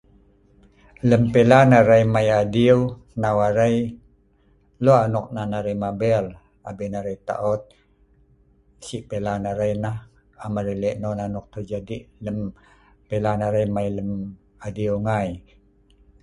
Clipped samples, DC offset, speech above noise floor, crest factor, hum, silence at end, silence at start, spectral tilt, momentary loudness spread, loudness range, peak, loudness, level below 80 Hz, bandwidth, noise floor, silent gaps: under 0.1%; under 0.1%; 38 dB; 22 dB; none; 0.85 s; 1.05 s; -7.5 dB/octave; 18 LU; 12 LU; 0 dBFS; -21 LUFS; -48 dBFS; 11 kHz; -59 dBFS; none